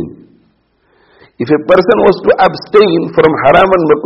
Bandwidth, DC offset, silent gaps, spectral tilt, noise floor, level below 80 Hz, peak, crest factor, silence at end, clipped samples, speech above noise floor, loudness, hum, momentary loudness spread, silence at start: 6.2 kHz; under 0.1%; none; -8 dB/octave; -55 dBFS; -40 dBFS; 0 dBFS; 10 dB; 0 s; 0.3%; 46 dB; -9 LUFS; none; 7 LU; 0 s